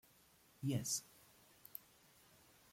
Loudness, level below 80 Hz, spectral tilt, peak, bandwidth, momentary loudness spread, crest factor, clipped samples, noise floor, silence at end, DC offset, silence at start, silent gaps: -44 LUFS; -78 dBFS; -4 dB/octave; -26 dBFS; 16.5 kHz; 26 LU; 22 dB; under 0.1%; -70 dBFS; 0.95 s; under 0.1%; 0.6 s; none